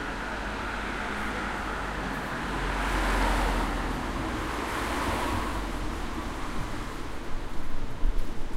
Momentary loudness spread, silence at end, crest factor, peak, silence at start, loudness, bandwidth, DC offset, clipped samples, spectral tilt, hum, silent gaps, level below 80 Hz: 10 LU; 0 s; 16 dB; -12 dBFS; 0 s; -31 LUFS; 15.5 kHz; under 0.1%; under 0.1%; -4.5 dB/octave; none; none; -34 dBFS